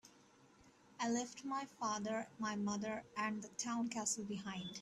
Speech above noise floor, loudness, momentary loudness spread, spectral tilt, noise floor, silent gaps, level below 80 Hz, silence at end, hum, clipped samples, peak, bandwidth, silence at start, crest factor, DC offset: 25 dB; -42 LUFS; 5 LU; -3.5 dB/octave; -67 dBFS; none; -80 dBFS; 0 s; none; under 0.1%; -26 dBFS; 13 kHz; 0.05 s; 16 dB; under 0.1%